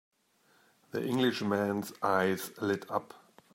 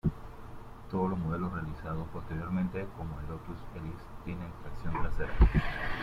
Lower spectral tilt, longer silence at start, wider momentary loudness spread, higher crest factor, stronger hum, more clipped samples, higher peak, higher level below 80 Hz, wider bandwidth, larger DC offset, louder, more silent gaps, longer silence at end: second, -5.5 dB/octave vs -8.5 dB/octave; first, 0.95 s vs 0.05 s; second, 8 LU vs 16 LU; about the same, 20 dB vs 22 dB; neither; neither; second, -14 dBFS vs -10 dBFS; second, -78 dBFS vs -36 dBFS; first, 16 kHz vs 7.2 kHz; neither; first, -32 LUFS vs -35 LUFS; neither; first, 0.4 s vs 0 s